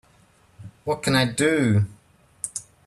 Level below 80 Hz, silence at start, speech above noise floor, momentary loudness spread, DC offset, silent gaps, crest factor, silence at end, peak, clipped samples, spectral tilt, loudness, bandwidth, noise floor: -58 dBFS; 0.6 s; 37 dB; 13 LU; under 0.1%; none; 18 dB; 0.25 s; -8 dBFS; under 0.1%; -5 dB/octave; -23 LUFS; 13 kHz; -57 dBFS